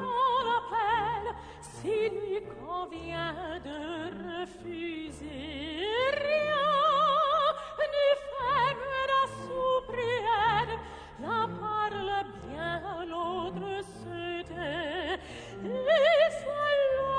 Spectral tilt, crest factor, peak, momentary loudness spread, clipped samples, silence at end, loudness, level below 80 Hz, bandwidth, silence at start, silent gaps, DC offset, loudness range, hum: -5 dB/octave; 18 dB; -12 dBFS; 14 LU; under 0.1%; 0 s; -30 LUFS; -54 dBFS; 10 kHz; 0 s; none; under 0.1%; 8 LU; none